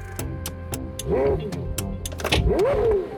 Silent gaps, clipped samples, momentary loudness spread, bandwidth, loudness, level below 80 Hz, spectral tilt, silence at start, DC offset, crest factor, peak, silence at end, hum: none; under 0.1%; 11 LU; 19 kHz; -25 LUFS; -32 dBFS; -5 dB/octave; 0 s; under 0.1%; 18 dB; -6 dBFS; 0 s; none